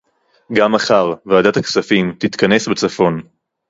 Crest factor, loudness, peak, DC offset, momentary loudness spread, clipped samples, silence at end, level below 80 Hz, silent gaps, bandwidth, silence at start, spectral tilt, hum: 16 dB; -15 LUFS; 0 dBFS; under 0.1%; 5 LU; under 0.1%; 0.45 s; -52 dBFS; none; 8 kHz; 0.5 s; -5 dB/octave; none